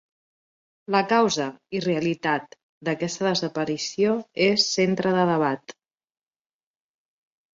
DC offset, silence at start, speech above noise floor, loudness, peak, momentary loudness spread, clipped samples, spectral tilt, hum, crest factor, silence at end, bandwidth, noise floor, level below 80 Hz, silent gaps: under 0.1%; 0.9 s; over 67 dB; -24 LUFS; -6 dBFS; 9 LU; under 0.1%; -4.5 dB/octave; none; 18 dB; 1.85 s; 7.8 kHz; under -90 dBFS; -66 dBFS; 2.63-2.81 s